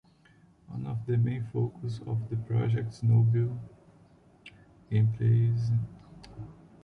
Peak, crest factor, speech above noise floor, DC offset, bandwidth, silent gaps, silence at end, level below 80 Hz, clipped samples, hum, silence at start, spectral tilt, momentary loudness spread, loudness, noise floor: -16 dBFS; 14 dB; 33 dB; under 0.1%; 6 kHz; none; 0.3 s; -58 dBFS; under 0.1%; none; 0.7 s; -9.5 dB/octave; 21 LU; -29 LUFS; -60 dBFS